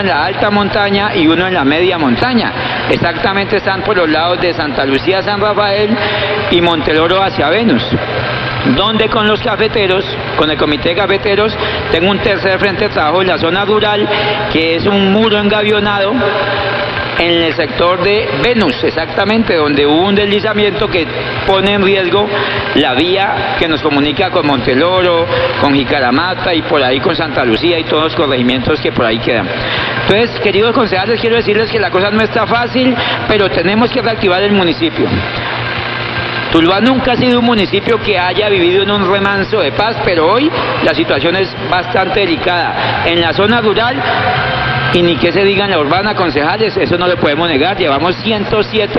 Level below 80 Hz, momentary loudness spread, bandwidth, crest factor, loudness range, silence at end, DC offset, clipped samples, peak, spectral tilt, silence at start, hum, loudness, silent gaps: -36 dBFS; 4 LU; 7.4 kHz; 12 dB; 1 LU; 0 s; under 0.1%; under 0.1%; 0 dBFS; -7 dB/octave; 0 s; none; -11 LUFS; none